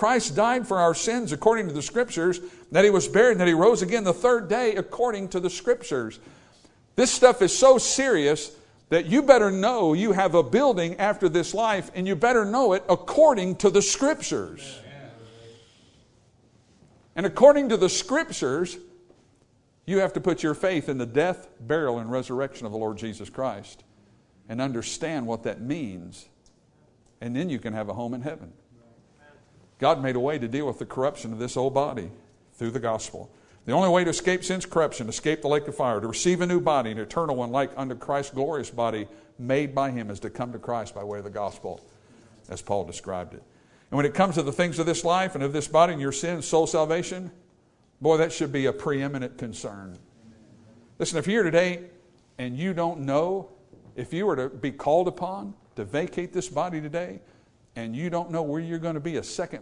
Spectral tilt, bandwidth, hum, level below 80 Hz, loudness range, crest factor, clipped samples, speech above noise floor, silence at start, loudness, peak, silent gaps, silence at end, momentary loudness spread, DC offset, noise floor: -4.5 dB/octave; 11 kHz; none; -58 dBFS; 11 LU; 24 dB; under 0.1%; 38 dB; 0 s; -24 LUFS; -2 dBFS; none; 0 s; 16 LU; under 0.1%; -62 dBFS